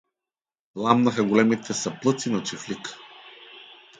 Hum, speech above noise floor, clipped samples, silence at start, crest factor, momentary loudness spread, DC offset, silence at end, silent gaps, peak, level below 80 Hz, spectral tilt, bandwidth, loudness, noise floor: none; over 67 dB; under 0.1%; 0.75 s; 24 dB; 23 LU; under 0.1%; 0.35 s; none; -2 dBFS; -68 dBFS; -5 dB/octave; 9.4 kHz; -24 LUFS; under -90 dBFS